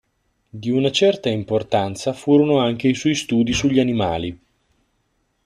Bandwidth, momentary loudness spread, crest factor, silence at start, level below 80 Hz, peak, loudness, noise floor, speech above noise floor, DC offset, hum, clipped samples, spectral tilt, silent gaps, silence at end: 12.5 kHz; 8 LU; 16 dB; 0.55 s; -48 dBFS; -4 dBFS; -19 LUFS; -68 dBFS; 50 dB; under 0.1%; none; under 0.1%; -5.5 dB/octave; none; 1.1 s